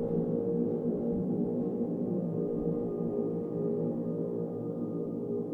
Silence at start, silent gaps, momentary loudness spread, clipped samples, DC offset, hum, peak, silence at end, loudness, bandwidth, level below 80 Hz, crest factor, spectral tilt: 0 s; none; 4 LU; under 0.1%; under 0.1%; none; -18 dBFS; 0 s; -33 LUFS; 2.2 kHz; -58 dBFS; 14 dB; -12.5 dB/octave